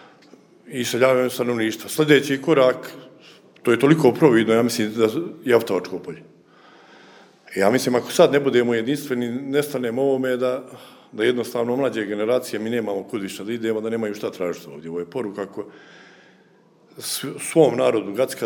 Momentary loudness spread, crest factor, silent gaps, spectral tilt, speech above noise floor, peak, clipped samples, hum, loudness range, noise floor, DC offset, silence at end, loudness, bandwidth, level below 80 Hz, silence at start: 15 LU; 20 dB; none; -5 dB/octave; 34 dB; -2 dBFS; under 0.1%; none; 9 LU; -55 dBFS; under 0.1%; 0 s; -21 LUFS; over 20 kHz; -72 dBFS; 0.65 s